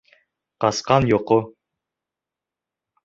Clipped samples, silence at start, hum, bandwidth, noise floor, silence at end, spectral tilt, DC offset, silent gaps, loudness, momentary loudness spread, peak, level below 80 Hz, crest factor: under 0.1%; 0.6 s; none; 8 kHz; -87 dBFS; 1.55 s; -5.5 dB/octave; under 0.1%; none; -20 LUFS; 6 LU; -2 dBFS; -50 dBFS; 22 dB